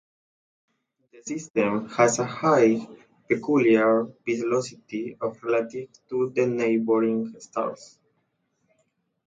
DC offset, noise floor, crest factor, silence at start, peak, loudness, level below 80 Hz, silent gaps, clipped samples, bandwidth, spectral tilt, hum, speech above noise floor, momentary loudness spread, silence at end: under 0.1%; -73 dBFS; 20 dB; 1.15 s; -6 dBFS; -24 LUFS; -70 dBFS; 1.50-1.54 s; under 0.1%; 9.4 kHz; -5.5 dB/octave; none; 49 dB; 14 LU; 1.45 s